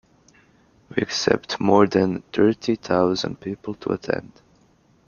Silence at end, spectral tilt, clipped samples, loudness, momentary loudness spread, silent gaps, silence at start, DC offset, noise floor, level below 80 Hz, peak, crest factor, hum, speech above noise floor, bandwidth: 0.85 s; -5.5 dB/octave; under 0.1%; -22 LUFS; 12 LU; none; 0.9 s; under 0.1%; -58 dBFS; -56 dBFS; -2 dBFS; 22 dB; none; 37 dB; 7.2 kHz